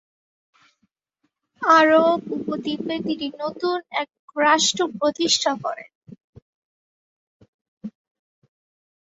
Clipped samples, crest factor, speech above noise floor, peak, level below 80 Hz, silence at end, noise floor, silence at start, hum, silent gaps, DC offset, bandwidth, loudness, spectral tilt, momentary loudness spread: under 0.1%; 20 dB; 53 dB; -4 dBFS; -68 dBFS; 1.3 s; -74 dBFS; 1.6 s; none; 4.19-4.28 s, 5.95-6.01 s, 6.24-6.33 s, 6.42-7.40 s, 7.48-7.81 s; under 0.1%; 8.2 kHz; -21 LUFS; -2.5 dB/octave; 17 LU